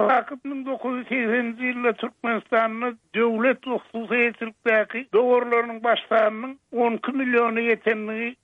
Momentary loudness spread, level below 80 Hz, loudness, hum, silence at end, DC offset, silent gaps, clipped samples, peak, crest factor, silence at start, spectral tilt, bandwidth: 9 LU; -76 dBFS; -23 LUFS; none; 0.1 s; under 0.1%; none; under 0.1%; -8 dBFS; 14 dB; 0 s; -6.5 dB/octave; 4.8 kHz